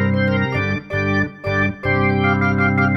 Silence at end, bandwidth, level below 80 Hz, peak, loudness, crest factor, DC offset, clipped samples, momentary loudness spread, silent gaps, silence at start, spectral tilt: 0 s; 6.2 kHz; -44 dBFS; -4 dBFS; -18 LUFS; 14 dB; under 0.1%; under 0.1%; 5 LU; none; 0 s; -8 dB/octave